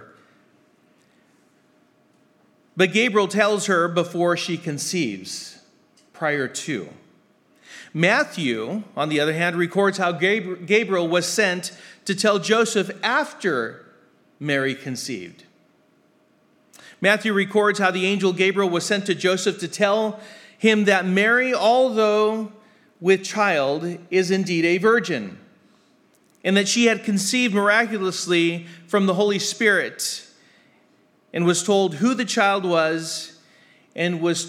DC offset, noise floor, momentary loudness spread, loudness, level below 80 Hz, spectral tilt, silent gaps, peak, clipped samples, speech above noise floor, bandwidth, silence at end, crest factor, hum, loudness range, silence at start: under 0.1%; -60 dBFS; 11 LU; -21 LUFS; -82 dBFS; -4 dB/octave; none; -2 dBFS; under 0.1%; 39 dB; 15.5 kHz; 0 s; 20 dB; none; 6 LU; 0 s